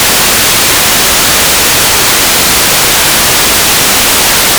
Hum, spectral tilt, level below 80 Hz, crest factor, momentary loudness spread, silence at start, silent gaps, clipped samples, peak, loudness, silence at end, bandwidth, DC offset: none; -0.5 dB/octave; -28 dBFS; 6 dB; 0 LU; 0 s; none; 8%; 0 dBFS; -4 LUFS; 0 s; over 20 kHz; under 0.1%